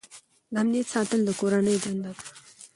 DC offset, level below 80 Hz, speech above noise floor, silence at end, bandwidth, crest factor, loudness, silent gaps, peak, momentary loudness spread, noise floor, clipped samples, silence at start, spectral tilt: under 0.1%; -68 dBFS; 27 dB; 0.1 s; 11.5 kHz; 16 dB; -26 LUFS; none; -12 dBFS; 17 LU; -52 dBFS; under 0.1%; 0.1 s; -5 dB/octave